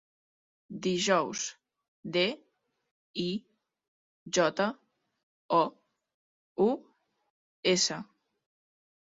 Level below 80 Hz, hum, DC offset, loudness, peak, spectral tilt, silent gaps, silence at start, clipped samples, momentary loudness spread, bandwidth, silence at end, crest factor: -76 dBFS; none; under 0.1%; -30 LUFS; -12 dBFS; -3.5 dB/octave; 1.88-2.03 s, 2.91-3.14 s, 3.88-4.26 s, 5.23-5.49 s, 6.14-6.56 s, 7.30-7.63 s; 0.7 s; under 0.1%; 17 LU; 8 kHz; 1.05 s; 22 dB